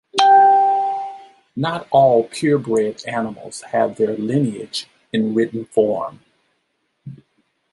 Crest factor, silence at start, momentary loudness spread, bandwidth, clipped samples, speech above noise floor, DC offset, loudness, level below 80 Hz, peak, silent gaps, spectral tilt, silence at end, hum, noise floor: 18 dB; 0.15 s; 15 LU; 11.5 kHz; under 0.1%; 51 dB; under 0.1%; -18 LUFS; -64 dBFS; -2 dBFS; none; -5.5 dB/octave; 0.6 s; none; -70 dBFS